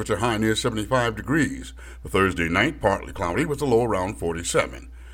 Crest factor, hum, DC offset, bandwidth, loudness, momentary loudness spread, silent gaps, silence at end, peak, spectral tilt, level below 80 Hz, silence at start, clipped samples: 18 dB; none; under 0.1%; 17 kHz; -23 LUFS; 7 LU; none; 0 s; -6 dBFS; -5 dB/octave; -40 dBFS; 0 s; under 0.1%